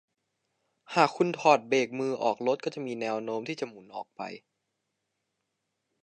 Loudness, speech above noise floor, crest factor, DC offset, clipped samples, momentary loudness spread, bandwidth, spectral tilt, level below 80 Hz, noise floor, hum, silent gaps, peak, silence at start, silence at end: -28 LUFS; 53 dB; 24 dB; under 0.1%; under 0.1%; 17 LU; 10.5 kHz; -5 dB/octave; -84 dBFS; -82 dBFS; none; none; -6 dBFS; 0.9 s; 1.65 s